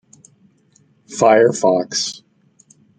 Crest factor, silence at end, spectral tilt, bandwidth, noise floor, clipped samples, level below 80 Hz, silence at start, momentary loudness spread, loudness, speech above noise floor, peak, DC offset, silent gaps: 18 dB; 0.8 s; -3.5 dB/octave; 9.4 kHz; -56 dBFS; under 0.1%; -66 dBFS; 1.1 s; 18 LU; -16 LUFS; 42 dB; -2 dBFS; under 0.1%; none